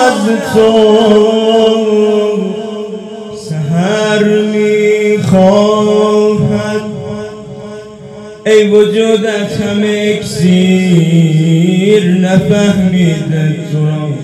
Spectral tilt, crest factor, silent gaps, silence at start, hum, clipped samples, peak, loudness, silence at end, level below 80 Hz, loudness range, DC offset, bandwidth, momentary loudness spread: -6.5 dB/octave; 10 dB; none; 0 s; none; 0.8%; 0 dBFS; -10 LUFS; 0 s; -46 dBFS; 3 LU; under 0.1%; 12.5 kHz; 15 LU